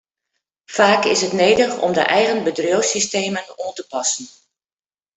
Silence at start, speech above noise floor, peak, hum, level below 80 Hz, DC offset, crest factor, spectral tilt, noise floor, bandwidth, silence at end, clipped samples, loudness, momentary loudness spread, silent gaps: 0.7 s; over 72 dB; -2 dBFS; none; -60 dBFS; under 0.1%; 18 dB; -2.5 dB/octave; under -90 dBFS; 8.4 kHz; 0.85 s; under 0.1%; -17 LUFS; 12 LU; none